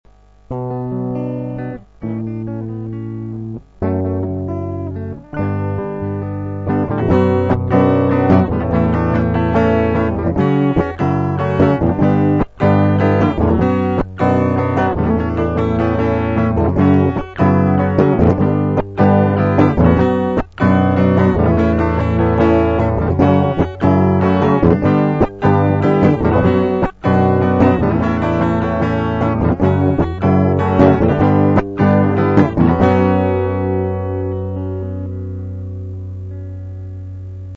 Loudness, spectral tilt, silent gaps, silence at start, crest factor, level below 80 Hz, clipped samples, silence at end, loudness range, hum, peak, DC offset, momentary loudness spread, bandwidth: -15 LUFS; -10 dB/octave; none; 0.5 s; 14 dB; -32 dBFS; under 0.1%; 0 s; 9 LU; 50 Hz at -35 dBFS; 0 dBFS; under 0.1%; 13 LU; 6.8 kHz